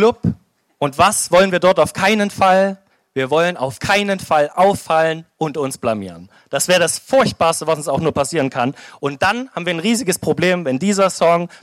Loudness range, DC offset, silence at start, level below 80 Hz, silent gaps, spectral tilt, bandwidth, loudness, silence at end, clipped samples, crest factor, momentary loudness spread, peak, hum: 3 LU; under 0.1%; 0 s; -50 dBFS; none; -4 dB/octave; 16 kHz; -17 LUFS; 0.05 s; under 0.1%; 14 dB; 10 LU; -2 dBFS; none